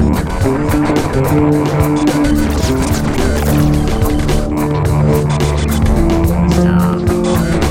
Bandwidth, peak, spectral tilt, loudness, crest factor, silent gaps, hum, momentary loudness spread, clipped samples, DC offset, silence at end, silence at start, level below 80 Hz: 17 kHz; 0 dBFS; -6.5 dB/octave; -13 LUFS; 12 dB; none; none; 3 LU; under 0.1%; under 0.1%; 0 s; 0 s; -20 dBFS